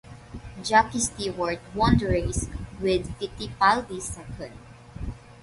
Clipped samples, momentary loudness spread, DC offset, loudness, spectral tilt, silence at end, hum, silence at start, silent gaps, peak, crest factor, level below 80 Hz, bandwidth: under 0.1%; 18 LU; under 0.1%; -25 LUFS; -4.5 dB/octave; 0.1 s; none; 0.05 s; none; -6 dBFS; 20 dB; -40 dBFS; 11.5 kHz